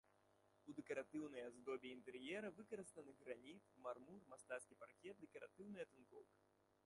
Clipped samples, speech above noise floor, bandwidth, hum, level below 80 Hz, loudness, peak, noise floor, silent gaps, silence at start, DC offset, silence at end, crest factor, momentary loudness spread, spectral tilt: under 0.1%; 23 dB; 11.5 kHz; none; under -90 dBFS; -55 LUFS; -36 dBFS; -79 dBFS; none; 0.25 s; under 0.1%; 0.4 s; 20 dB; 12 LU; -4.5 dB/octave